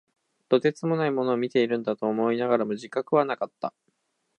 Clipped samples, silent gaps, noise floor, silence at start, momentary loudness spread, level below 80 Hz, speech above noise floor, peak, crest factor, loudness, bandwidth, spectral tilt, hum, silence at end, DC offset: under 0.1%; none; -73 dBFS; 0.5 s; 7 LU; -78 dBFS; 49 dB; -6 dBFS; 20 dB; -26 LUFS; 9.2 kHz; -7 dB/octave; none; 0.7 s; under 0.1%